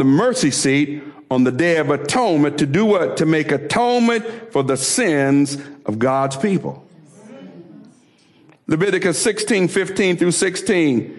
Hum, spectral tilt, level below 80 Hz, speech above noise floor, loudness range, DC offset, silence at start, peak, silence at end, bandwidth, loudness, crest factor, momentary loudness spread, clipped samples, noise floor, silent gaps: none; -4.5 dB/octave; -58 dBFS; 36 dB; 6 LU; under 0.1%; 0 s; -8 dBFS; 0 s; 12 kHz; -17 LUFS; 10 dB; 7 LU; under 0.1%; -53 dBFS; none